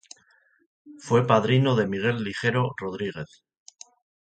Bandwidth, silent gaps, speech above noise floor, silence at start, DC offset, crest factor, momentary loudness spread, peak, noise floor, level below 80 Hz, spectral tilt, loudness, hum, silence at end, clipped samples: 9 kHz; none; 39 dB; 0.85 s; under 0.1%; 22 dB; 16 LU; -4 dBFS; -63 dBFS; -60 dBFS; -6.5 dB/octave; -24 LUFS; none; 1 s; under 0.1%